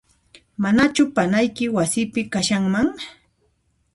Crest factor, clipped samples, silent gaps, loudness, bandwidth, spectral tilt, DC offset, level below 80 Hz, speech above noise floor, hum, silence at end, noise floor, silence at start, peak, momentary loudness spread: 16 dB; under 0.1%; none; -20 LUFS; 11.5 kHz; -4.5 dB/octave; under 0.1%; -52 dBFS; 46 dB; none; 0.85 s; -66 dBFS; 0.6 s; -6 dBFS; 10 LU